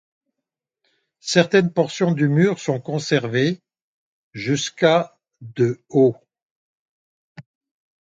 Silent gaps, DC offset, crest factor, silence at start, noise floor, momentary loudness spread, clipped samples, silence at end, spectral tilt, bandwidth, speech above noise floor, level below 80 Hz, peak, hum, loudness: 3.82-4.31 s, 6.42-7.35 s; under 0.1%; 22 dB; 1.25 s; -84 dBFS; 16 LU; under 0.1%; 0.6 s; -5.5 dB/octave; 9.2 kHz; 65 dB; -66 dBFS; 0 dBFS; none; -20 LUFS